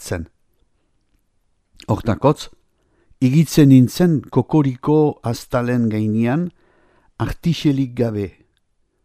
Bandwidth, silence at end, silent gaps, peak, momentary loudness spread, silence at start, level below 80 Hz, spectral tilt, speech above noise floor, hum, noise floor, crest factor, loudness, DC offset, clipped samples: 15 kHz; 0.75 s; none; 0 dBFS; 15 LU; 0 s; -44 dBFS; -7.5 dB/octave; 48 dB; none; -65 dBFS; 18 dB; -18 LUFS; under 0.1%; under 0.1%